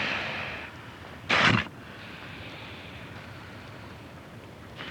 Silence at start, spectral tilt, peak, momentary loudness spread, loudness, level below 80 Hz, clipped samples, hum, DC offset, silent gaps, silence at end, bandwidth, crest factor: 0 s; -4.5 dB/octave; -10 dBFS; 22 LU; -28 LUFS; -56 dBFS; under 0.1%; none; under 0.1%; none; 0 s; 19.5 kHz; 22 dB